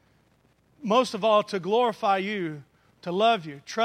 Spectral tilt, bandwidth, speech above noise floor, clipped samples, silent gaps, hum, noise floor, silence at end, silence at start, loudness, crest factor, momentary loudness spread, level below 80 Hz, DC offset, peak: -5 dB/octave; 13.5 kHz; 40 dB; under 0.1%; none; none; -64 dBFS; 0 s; 0.8 s; -25 LUFS; 16 dB; 13 LU; -74 dBFS; under 0.1%; -10 dBFS